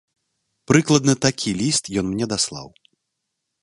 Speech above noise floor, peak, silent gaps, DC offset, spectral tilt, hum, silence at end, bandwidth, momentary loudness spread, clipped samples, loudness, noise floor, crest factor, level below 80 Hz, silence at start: 59 dB; 0 dBFS; none; under 0.1%; -4 dB/octave; none; 0.95 s; 11.5 kHz; 8 LU; under 0.1%; -20 LUFS; -78 dBFS; 22 dB; -52 dBFS; 0.7 s